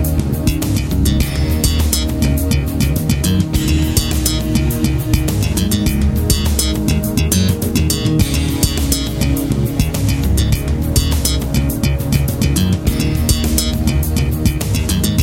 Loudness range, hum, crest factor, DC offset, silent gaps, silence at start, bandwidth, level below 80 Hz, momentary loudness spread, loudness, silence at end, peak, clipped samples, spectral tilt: 1 LU; none; 14 dB; under 0.1%; none; 0 s; 16.5 kHz; -20 dBFS; 2 LU; -16 LUFS; 0 s; 0 dBFS; under 0.1%; -5 dB/octave